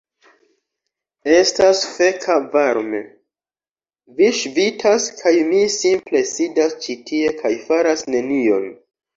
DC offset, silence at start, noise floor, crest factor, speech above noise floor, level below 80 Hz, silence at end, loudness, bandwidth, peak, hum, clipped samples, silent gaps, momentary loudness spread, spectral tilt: under 0.1%; 1.25 s; under -90 dBFS; 16 dB; over 73 dB; -62 dBFS; 0.4 s; -17 LUFS; 7.8 kHz; -2 dBFS; none; under 0.1%; none; 8 LU; -2.5 dB/octave